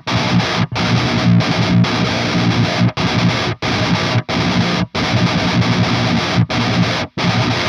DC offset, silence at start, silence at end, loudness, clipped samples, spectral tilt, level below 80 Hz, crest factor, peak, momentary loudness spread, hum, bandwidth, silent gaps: under 0.1%; 0.05 s; 0 s; -15 LUFS; under 0.1%; -5.5 dB/octave; -38 dBFS; 14 dB; -2 dBFS; 3 LU; none; 10 kHz; none